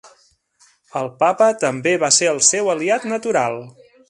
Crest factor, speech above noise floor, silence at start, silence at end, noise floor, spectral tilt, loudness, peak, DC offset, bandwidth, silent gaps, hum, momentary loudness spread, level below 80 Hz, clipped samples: 20 dB; 39 dB; 0.05 s; 0.4 s; -57 dBFS; -2 dB/octave; -17 LUFS; 0 dBFS; under 0.1%; 11.5 kHz; none; none; 13 LU; -68 dBFS; under 0.1%